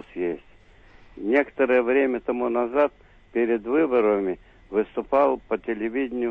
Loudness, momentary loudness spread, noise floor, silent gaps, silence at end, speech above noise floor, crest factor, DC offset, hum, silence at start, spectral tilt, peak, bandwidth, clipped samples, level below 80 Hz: -24 LUFS; 10 LU; -51 dBFS; none; 0 s; 29 dB; 16 dB; under 0.1%; none; 0.15 s; -8 dB/octave; -8 dBFS; 4.7 kHz; under 0.1%; -54 dBFS